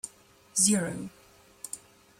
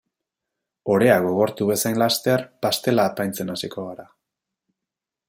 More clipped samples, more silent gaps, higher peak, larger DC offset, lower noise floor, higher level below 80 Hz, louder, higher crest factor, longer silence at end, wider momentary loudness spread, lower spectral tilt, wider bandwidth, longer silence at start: neither; neither; second, -8 dBFS vs -4 dBFS; neither; second, -57 dBFS vs -86 dBFS; about the same, -68 dBFS vs -64 dBFS; second, -26 LUFS vs -21 LUFS; about the same, 24 dB vs 20 dB; second, 0.45 s vs 1.25 s; first, 21 LU vs 15 LU; second, -3 dB/octave vs -4.5 dB/octave; about the same, 16 kHz vs 16.5 kHz; second, 0.05 s vs 0.85 s